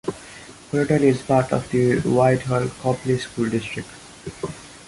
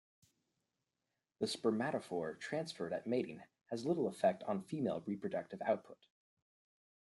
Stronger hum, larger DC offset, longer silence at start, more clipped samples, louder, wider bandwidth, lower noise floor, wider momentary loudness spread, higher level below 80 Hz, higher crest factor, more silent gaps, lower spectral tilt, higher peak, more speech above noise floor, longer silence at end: neither; neither; second, 0.05 s vs 1.4 s; neither; first, -21 LUFS vs -39 LUFS; about the same, 11.5 kHz vs 12 kHz; second, -42 dBFS vs -90 dBFS; first, 19 LU vs 7 LU; first, -50 dBFS vs -84 dBFS; about the same, 16 dB vs 20 dB; neither; about the same, -6.5 dB/octave vs -5.5 dB/octave; first, -4 dBFS vs -20 dBFS; second, 22 dB vs 51 dB; second, 0.05 s vs 1.1 s